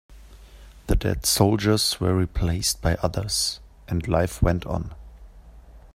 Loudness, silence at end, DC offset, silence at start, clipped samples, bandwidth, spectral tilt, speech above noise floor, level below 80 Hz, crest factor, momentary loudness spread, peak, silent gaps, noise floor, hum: -23 LUFS; 0.15 s; under 0.1%; 0.1 s; under 0.1%; 16 kHz; -4.5 dB/octave; 24 dB; -34 dBFS; 22 dB; 11 LU; -2 dBFS; none; -46 dBFS; none